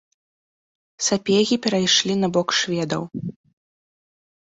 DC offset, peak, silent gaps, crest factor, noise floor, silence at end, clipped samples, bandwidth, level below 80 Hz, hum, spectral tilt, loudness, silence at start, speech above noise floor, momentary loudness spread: under 0.1%; -4 dBFS; none; 20 dB; under -90 dBFS; 1.2 s; under 0.1%; 8.4 kHz; -62 dBFS; none; -3.5 dB/octave; -20 LUFS; 1 s; over 69 dB; 12 LU